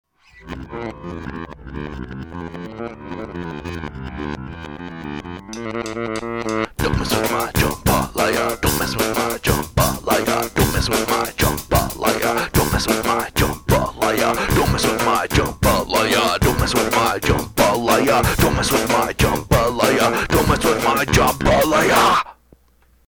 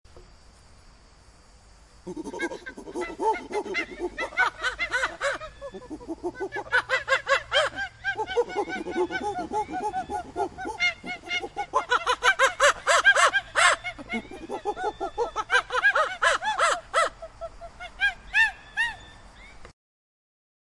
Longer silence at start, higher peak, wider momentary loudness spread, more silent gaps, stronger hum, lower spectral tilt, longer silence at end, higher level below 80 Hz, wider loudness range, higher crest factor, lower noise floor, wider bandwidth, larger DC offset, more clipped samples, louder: first, 0.35 s vs 0.15 s; first, 0 dBFS vs -6 dBFS; about the same, 15 LU vs 17 LU; neither; neither; first, -4.5 dB/octave vs -1.5 dB/octave; second, 0.85 s vs 1 s; first, -32 dBFS vs -54 dBFS; first, 14 LU vs 8 LU; about the same, 18 dB vs 22 dB; about the same, -56 dBFS vs -53 dBFS; first, over 20 kHz vs 11.5 kHz; neither; neither; first, -18 LUFS vs -25 LUFS